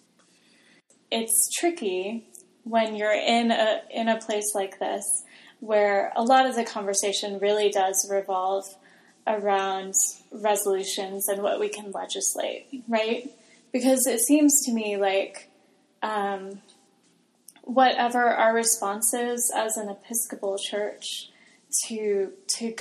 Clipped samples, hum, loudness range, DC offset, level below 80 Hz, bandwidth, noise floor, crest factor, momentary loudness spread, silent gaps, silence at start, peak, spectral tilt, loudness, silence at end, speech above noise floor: under 0.1%; none; 4 LU; under 0.1%; -88 dBFS; 15 kHz; -64 dBFS; 20 dB; 12 LU; none; 1.1 s; -6 dBFS; -1.5 dB/octave; -25 LUFS; 0 s; 39 dB